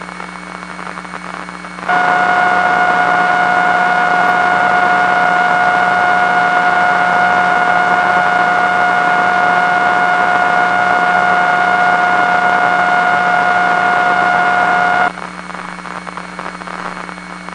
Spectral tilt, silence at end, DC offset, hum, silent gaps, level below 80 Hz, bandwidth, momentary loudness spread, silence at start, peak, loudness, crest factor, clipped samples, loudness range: -4 dB/octave; 0 s; under 0.1%; none; none; -50 dBFS; 11 kHz; 14 LU; 0 s; 0 dBFS; -11 LUFS; 12 dB; under 0.1%; 3 LU